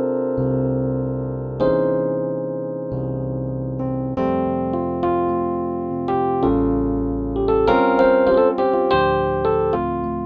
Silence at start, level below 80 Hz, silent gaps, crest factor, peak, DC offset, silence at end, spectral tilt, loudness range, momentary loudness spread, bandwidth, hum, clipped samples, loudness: 0 s; -38 dBFS; none; 16 dB; -4 dBFS; under 0.1%; 0 s; -10 dB/octave; 5 LU; 9 LU; 5.2 kHz; none; under 0.1%; -20 LUFS